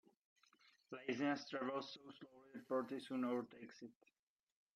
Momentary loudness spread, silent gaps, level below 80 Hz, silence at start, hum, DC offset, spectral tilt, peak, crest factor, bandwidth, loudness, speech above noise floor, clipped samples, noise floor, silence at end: 18 LU; none; under -90 dBFS; 0.9 s; none; under 0.1%; -5.5 dB/octave; -28 dBFS; 20 dB; 12.5 kHz; -45 LUFS; 28 dB; under 0.1%; -74 dBFS; 0.85 s